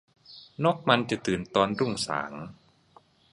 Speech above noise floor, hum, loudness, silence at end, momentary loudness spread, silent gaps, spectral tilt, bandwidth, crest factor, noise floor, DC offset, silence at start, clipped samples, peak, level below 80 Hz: 33 dB; none; -27 LUFS; 0.8 s; 20 LU; none; -5 dB/octave; 11.5 kHz; 26 dB; -60 dBFS; under 0.1%; 0.3 s; under 0.1%; -4 dBFS; -60 dBFS